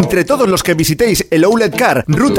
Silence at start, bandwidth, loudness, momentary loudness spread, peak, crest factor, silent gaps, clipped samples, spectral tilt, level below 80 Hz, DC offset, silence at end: 0 s; 18 kHz; -12 LUFS; 2 LU; 0 dBFS; 12 dB; none; under 0.1%; -5 dB/octave; -36 dBFS; under 0.1%; 0 s